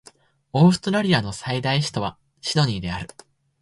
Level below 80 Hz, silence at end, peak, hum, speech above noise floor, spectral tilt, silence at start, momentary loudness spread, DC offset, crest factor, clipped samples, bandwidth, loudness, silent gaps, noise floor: -50 dBFS; 0.55 s; -4 dBFS; none; 32 dB; -5.5 dB/octave; 0.55 s; 14 LU; under 0.1%; 18 dB; under 0.1%; 11.5 kHz; -22 LUFS; none; -53 dBFS